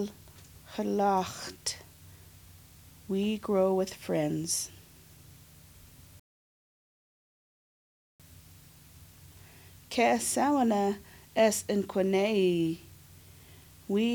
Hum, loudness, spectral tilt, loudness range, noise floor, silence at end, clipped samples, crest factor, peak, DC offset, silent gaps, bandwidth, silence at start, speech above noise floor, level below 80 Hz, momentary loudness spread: none; -29 LUFS; -4.5 dB/octave; 9 LU; -55 dBFS; 0 s; under 0.1%; 20 dB; -12 dBFS; under 0.1%; 6.19-8.19 s; over 20 kHz; 0 s; 27 dB; -64 dBFS; 13 LU